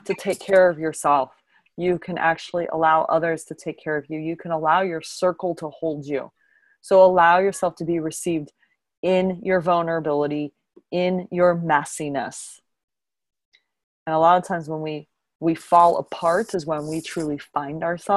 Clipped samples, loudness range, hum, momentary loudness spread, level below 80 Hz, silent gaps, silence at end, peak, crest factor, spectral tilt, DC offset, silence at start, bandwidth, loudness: under 0.1%; 5 LU; none; 13 LU; -62 dBFS; 8.97-9.03 s, 12.84-12.88 s, 13.45-13.52 s, 13.84-14.06 s; 0 s; -2 dBFS; 20 dB; -5.5 dB/octave; under 0.1%; 0.05 s; 12.5 kHz; -22 LUFS